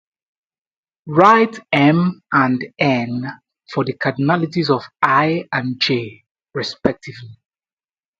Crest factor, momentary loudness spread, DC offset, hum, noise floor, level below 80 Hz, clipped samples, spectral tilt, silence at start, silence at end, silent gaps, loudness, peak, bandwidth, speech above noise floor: 18 dB; 13 LU; under 0.1%; none; under -90 dBFS; -58 dBFS; under 0.1%; -6.5 dB/octave; 1.05 s; 0.85 s; 6.31-6.35 s; -17 LUFS; 0 dBFS; 7.8 kHz; over 73 dB